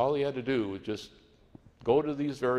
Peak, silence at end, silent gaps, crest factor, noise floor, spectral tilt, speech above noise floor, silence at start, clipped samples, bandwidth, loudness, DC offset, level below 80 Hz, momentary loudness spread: -12 dBFS; 0 s; none; 18 dB; -57 dBFS; -7 dB/octave; 27 dB; 0 s; under 0.1%; 11.5 kHz; -31 LUFS; under 0.1%; -62 dBFS; 11 LU